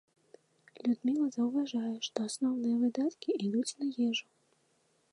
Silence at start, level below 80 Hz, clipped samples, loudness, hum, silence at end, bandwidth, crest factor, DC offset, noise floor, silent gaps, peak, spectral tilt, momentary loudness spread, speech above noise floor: 0.75 s; -88 dBFS; under 0.1%; -33 LUFS; none; 0.9 s; 11 kHz; 16 dB; under 0.1%; -73 dBFS; none; -16 dBFS; -4.5 dB/octave; 5 LU; 41 dB